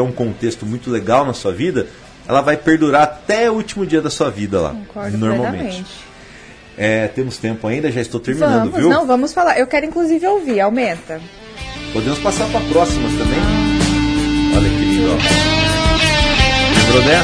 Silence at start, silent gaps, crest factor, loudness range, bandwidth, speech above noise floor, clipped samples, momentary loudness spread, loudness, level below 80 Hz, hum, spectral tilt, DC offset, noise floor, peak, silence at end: 0 s; none; 16 dB; 7 LU; 11 kHz; 23 dB; under 0.1%; 12 LU; -15 LUFS; -28 dBFS; none; -5 dB/octave; under 0.1%; -39 dBFS; 0 dBFS; 0 s